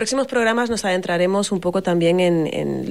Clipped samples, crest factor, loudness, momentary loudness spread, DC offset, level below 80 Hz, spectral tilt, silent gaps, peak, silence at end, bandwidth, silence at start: under 0.1%; 12 dB; -19 LUFS; 4 LU; 0.3%; -54 dBFS; -5 dB/octave; none; -8 dBFS; 0 s; 14.5 kHz; 0 s